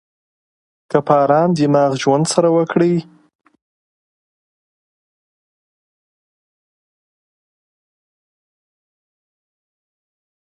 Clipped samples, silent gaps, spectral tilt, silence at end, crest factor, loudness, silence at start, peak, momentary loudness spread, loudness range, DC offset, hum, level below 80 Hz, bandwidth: under 0.1%; none; -6 dB/octave; 7.5 s; 20 dB; -15 LUFS; 0.9 s; 0 dBFS; 6 LU; 8 LU; under 0.1%; none; -66 dBFS; 11.5 kHz